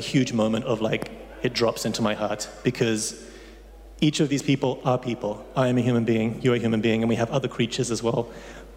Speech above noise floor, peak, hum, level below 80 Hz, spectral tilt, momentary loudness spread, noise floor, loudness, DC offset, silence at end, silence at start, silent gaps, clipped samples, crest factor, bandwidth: 20 dB; -10 dBFS; none; -50 dBFS; -5.5 dB/octave; 8 LU; -44 dBFS; -25 LUFS; under 0.1%; 0 s; 0 s; none; under 0.1%; 14 dB; 16 kHz